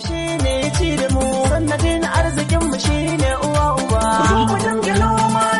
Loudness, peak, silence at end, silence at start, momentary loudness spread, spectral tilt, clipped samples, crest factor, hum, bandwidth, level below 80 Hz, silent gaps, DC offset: -17 LUFS; -6 dBFS; 0 s; 0 s; 3 LU; -5 dB/octave; under 0.1%; 12 dB; none; 11.5 kHz; -26 dBFS; none; under 0.1%